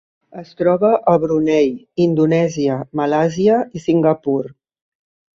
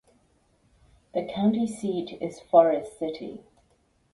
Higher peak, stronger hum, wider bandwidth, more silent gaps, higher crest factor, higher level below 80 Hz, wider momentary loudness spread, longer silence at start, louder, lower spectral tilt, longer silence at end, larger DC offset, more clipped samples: about the same, -2 dBFS vs -4 dBFS; neither; second, 7.6 kHz vs 11.5 kHz; neither; second, 16 dB vs 24 dB; first, -56 dBFS vs -64 dBFS; second, 7 LU vs 17 LU; second, 0.35 s vs 1.15 s; first, -17 LUFS vs -26 LUFS; about the same, -7.5 dB/octave vs -7 dB/octave; about the same, 0.85 s vs 0.75 s; neither; neither